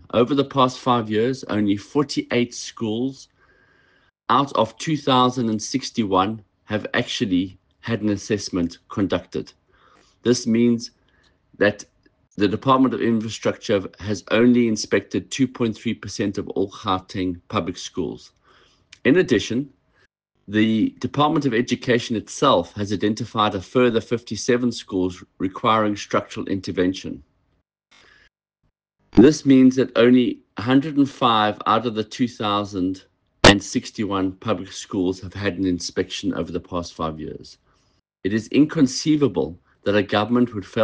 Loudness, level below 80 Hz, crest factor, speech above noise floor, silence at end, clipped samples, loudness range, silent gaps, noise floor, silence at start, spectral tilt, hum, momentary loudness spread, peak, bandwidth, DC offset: -21 LUFS; -50 dBFS; 22 dB; 51 dB; 0 s; under 0.1%; 7 LU; none; -72 dBFS; 0.15 s; -5 dB/octave; none; 12 LU; 0 dBFS; 9.6 kHz; under 0.1%